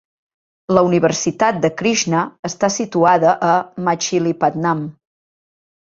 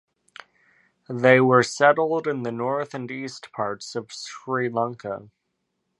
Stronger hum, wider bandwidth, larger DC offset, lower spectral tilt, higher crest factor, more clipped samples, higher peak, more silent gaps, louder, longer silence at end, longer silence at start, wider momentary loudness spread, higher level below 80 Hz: neither; second, 7.8 kHz vs 11.5 kHz; neither; about the same, -4.5 dB/octave vs -5.5 dB/octave; about the same, 18 dB vs 22 dB; neither; about the same, 0 dBFS vs -2 dBFS; first, 2.39-2.43 s vs none; first, -17 LUFS vs -22 LUFS; first, 1.05 s vs 0.75 s; second, 0.7 s vs 1.1 s; second, 7 LU vs 17 LU; first, -56 dBFS vs -70 dBFS